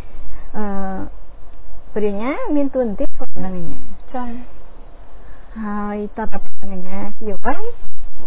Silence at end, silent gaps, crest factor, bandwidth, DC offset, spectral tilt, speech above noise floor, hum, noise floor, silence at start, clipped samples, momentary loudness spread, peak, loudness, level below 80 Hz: 0 s; none; 8 dB; 3.9 kHz; under 0.1%; -10.5 dB/octave; 24 dB; none; -31 dBFS; 0 s; under 0.1%; 24 LU; -2 dBFS; -25 LUFS; -36 dBFS